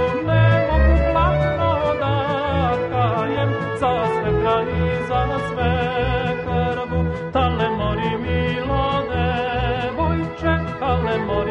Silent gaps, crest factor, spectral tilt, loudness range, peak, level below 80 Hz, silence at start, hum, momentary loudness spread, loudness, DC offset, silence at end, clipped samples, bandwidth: none; 14 dB; -8 dB/octave; 3 LU; -4 dBFS; -28 dBFS; 0 s; none; 5 LU; -20 LUFS; under 0.1%; 0 s; under 0.1%; 8.4 kHz